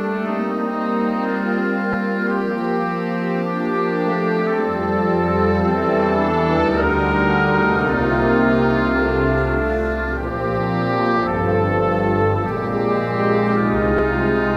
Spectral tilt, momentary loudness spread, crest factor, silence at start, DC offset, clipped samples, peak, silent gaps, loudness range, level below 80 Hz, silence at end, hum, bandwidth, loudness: -8.5 dB/octave; 5 LU; 14 dB; 0 s; under 0.1%; under 0.1%; -4 dBFS; none; 4 LU; -34 dBFS; 0 s; none; 8 kHz; -19 LUFS